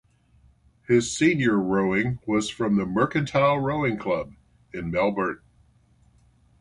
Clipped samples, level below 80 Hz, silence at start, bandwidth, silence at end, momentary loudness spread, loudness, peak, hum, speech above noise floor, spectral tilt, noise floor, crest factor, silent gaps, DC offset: under 0.1%; -52 dBFS; 0.9 s; 11.5 kHz; 1.25 s; 8 LU; -24 LUFS; -8 dBFS; none; 37 dB; -5.5 dB/octave; -60 dBFS; 18 dB; none; under 0.1%